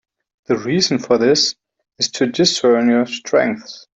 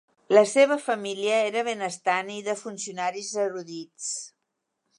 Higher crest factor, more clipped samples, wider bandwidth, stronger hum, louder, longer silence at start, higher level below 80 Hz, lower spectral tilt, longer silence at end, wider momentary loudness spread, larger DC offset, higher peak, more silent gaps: about the same, 16 dB vs 20 dB; neither; second, 8.2 kHz vs 11.5 kHz; neither; first, -16 LUFS vs -25 LUFS; first, 0.5 s vs 0.3 s; first, -60 dBFS vs -82 dBFS; about the same, -3.5 dB/octave vs -2.5 dB/octave; second, 0.2 s vs 0.7 s; second, 8 LU vs 14 LU; neither; first, -2 dBFS vs -6 dBFS; neither